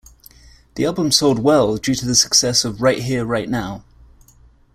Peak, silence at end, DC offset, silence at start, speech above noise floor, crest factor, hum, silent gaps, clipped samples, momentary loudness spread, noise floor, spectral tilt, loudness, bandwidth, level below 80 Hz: 0 dBFS; 0.95 s; under 0.1%; 0.75 s; 33 dB; 20 dB; none; none; under 0.1%; 11 LU; -50 dBFS; -3.5 dB/octave; -16 LUFS; 16 kHz; -46 dBFS